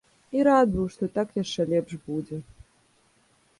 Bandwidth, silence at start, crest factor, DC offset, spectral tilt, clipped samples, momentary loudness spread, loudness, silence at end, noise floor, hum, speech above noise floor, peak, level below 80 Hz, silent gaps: 11.5 kHz; 0.3 s; 18 dB; under 0.1%; -6.5 dB/octave; under 0.1%; 13 LU; -25 LUFS; 1.15 s; -64 dBFS; none; 39 dB; -8 dBFS; -52 dBFS; none